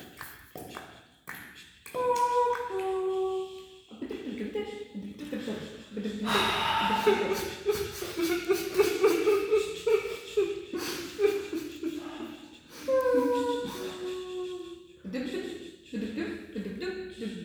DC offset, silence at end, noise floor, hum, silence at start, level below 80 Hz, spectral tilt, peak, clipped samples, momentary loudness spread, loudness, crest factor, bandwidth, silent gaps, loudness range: under 0.1%; 0 s; -51 dBFS; none; 0 s; -60 dBFS; -4 dB/octave; -12 dBFS; under 0.1%; 18 LU; -30 LUFS; 20 dB; over 20 kHz; none; 8 LU